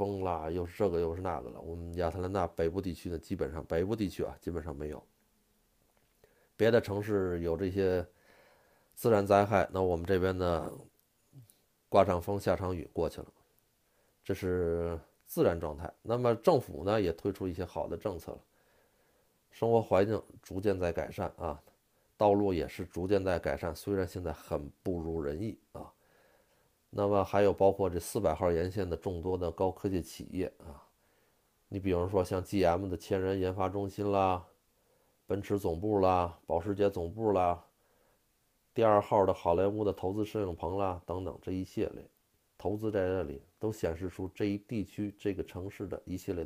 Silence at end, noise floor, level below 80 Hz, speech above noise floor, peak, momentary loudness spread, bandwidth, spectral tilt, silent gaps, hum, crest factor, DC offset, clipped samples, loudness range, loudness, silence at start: 0 s; -74 dBFS; -54 dBFS; 42 dB; -10 dBFS; 13 LU; 15.5 kHz; -7 dB/octave; none; none; 24 dB; under 0.1%; under 0.1%; 6 LU; -33 LUFS; 0 s